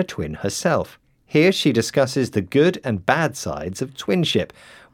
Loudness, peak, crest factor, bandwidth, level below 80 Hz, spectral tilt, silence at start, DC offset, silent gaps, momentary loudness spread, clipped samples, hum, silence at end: -21 LUFS; 0 dBFS; 20 dB; 17.5 kHz; -54 dBFS; -5 dB/octave; 0 s; under 0.1%; none; 11 LU; under 0.1%; none; 0.5 s